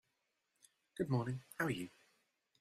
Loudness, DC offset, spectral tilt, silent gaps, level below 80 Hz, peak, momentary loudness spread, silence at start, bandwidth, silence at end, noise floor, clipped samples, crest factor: -41 LUFS; under 0.1%; -6.5 dB/octave; none; -74 dBFS; -22 dBFS; 12 LU; 0.95 s; 14 kHz; 0.7 s; -85 dBFS; under 0.1%; 22 dB